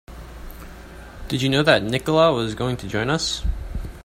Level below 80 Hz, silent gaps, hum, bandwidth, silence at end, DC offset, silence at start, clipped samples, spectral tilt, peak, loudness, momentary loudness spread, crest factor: -34 dBFS; none; none; 16 kHz; 0.05 s; under 0.1%; 0.1 s; under 0.1%; -5 dB/octave; 0 dBFS; -21 LUFS; 23 LU; 22 dB